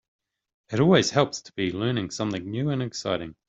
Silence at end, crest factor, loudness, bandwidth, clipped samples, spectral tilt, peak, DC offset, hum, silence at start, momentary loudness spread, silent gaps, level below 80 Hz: 0.15 s; 22 dB; -25 LUFS; 8.2 kHz; under 0.1%; -5.5 dB/octave; -4 dBFS; under 0.1%; none; 0.7 s; 10 LU; none; -60 dBFS